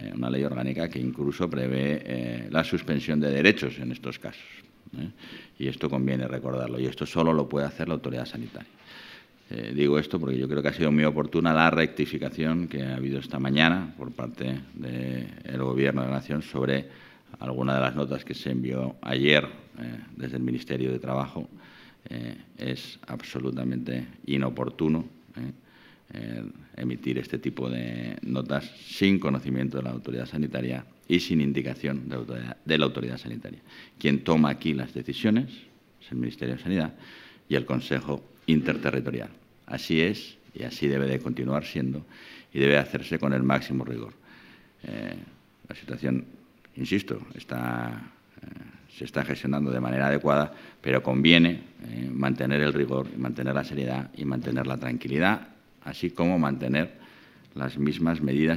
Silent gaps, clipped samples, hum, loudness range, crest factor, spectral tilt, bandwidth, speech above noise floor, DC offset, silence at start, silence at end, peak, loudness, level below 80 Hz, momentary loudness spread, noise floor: none; under 0.1%; none; 9 LU; 28 dB; -7 dB/octave; 15.5 kHz; 28 dB; under 0.1%; 0 s; 0 s; 0 dBFS; -27 LUFS; -56 dBFS; 16 LU; -55 dBFS